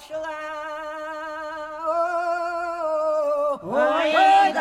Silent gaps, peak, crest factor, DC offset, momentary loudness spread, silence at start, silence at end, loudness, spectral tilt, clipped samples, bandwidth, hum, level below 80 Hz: none; -6 dBFS; 16 dB; under 0.1%; 15 LU; 0 s; 0 s; -23 LUFS; -3.5 dB/octave; under 0.1%; 11.5 kHz; none; -62 dBFS